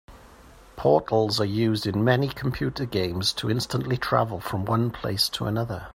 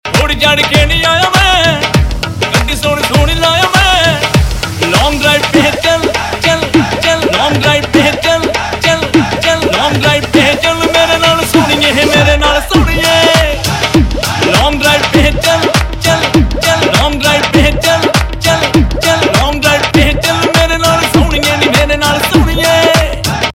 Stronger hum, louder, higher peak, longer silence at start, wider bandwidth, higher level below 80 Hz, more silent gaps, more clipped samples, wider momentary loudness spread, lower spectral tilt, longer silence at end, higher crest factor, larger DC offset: neither; second, -25 LUFS vs -9 LUFS; second, -6 dBFS vs 0 dBFS; about the same, 0.1 s vs 0.05 s; about the same, 16 kHz vs 17 kHz; second, -50 dBFS vs -20 dBFS; neither; second, under 0.1% vs 0.8%; about the same, 6 LU vs 4 LU; first, -5.5 dB/octave vs -4 dB/octave; about the same, 0.05 s vs 0.05 s; first, 20 dB vs 10 dB; neither